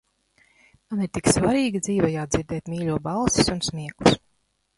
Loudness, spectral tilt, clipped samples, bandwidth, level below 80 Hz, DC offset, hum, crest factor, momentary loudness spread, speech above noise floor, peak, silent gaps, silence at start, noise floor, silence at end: -23 LUFS; -4.5 dB/octave; under 0.1%; 11.5 kHz; -44 dBFS; under 0.1%; none; 22 dB; 8 LU; 47 dB; -2 dBFS; none; 0.9 s; -70 dBFS; 0.6 s